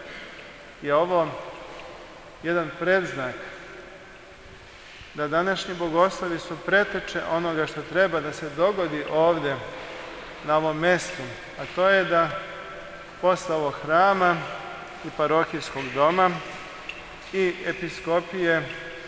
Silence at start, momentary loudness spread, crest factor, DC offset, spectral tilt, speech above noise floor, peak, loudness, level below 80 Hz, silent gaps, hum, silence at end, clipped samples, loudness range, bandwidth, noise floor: 0 s; 19 LU; 20 dB; under 0.1%; -5 dB/octave; 21 dB; -6 dBFS; -24 LUFS; -56 dBFS; none; none; 0 s; under 0.1%; 5 LU; 8 kHz; -45 dBFS